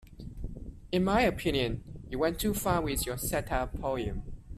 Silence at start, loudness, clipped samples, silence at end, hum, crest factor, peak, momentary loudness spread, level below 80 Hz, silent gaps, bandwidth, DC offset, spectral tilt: 0.05 s; -31 LUFS; under 0.1%; 0 s; none; 18 dB; -14 dBFS; 17 LU; -42 dBFS; none; 15.5 kHz; under 0.1%; -5 dB/octave